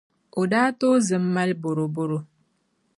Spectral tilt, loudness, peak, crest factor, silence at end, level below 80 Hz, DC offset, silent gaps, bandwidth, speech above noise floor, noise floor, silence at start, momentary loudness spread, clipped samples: -6 dB/octave; -23 LUFS; -8 dBFS; 16 dB; 0.75 s; -72 dBFS; under 0.1%; none; 11.5 kHz; 47 dB; -70 dBFS; 0.35 s; 9 LU; under 0.1%